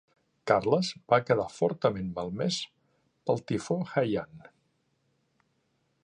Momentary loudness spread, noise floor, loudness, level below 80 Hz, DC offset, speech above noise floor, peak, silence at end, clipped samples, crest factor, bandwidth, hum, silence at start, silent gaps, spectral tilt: 10 LU; -74 dBFS; -29 LUFS; -62 dBFS; under 0.1%; 46 dB; -8 dBFS; 1.65 s; under 0.1%; 24 dB; 10.5 kHz; none; 0.45 s; none; -5.5 dB/octave